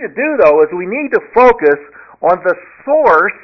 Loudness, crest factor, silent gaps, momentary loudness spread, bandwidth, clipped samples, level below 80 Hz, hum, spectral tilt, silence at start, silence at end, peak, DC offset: -12 LUFS; 12 dB; none; 9 LU; 6.2 kHz; under 0.1%; -46 dBFS; none; -7 dB/octave; 0 s; 0.1 s; 0 dBFS; under 0.1%